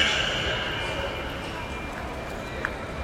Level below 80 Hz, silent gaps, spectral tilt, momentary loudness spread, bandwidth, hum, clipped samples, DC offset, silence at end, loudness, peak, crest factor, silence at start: -40 dBFS; none; -3.5 dB/octave; 9 LU; 16 kHz; none; under 0.1%; under 0.1%; 0 s; -29 LUFS; -6 dBFS; 22 dB; 0 s